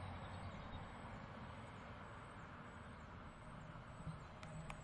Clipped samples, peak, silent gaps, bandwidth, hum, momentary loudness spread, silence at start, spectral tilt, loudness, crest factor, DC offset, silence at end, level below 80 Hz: under 0.1%; -32 dBFS; none; 10.5 kHz; none; 4 LU; 0 s; -6 dB/octave; -54 LUFS; 20 dB; under 0.1%; 0 s; -62 dBFS